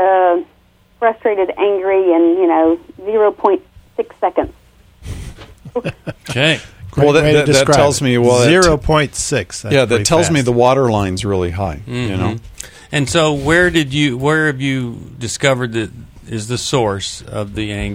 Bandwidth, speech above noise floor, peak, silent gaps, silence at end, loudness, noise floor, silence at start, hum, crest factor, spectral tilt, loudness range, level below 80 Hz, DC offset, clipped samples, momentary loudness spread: 16 kHz; 37 dB; 0 dBFS; none; 0 s; -15 LUFS; -51 dBFS; 0 s; none; 14 dB; -5 dB/octave; 7 LU; -36 dBFS; under 0.1%; under 0.1%; 15 LU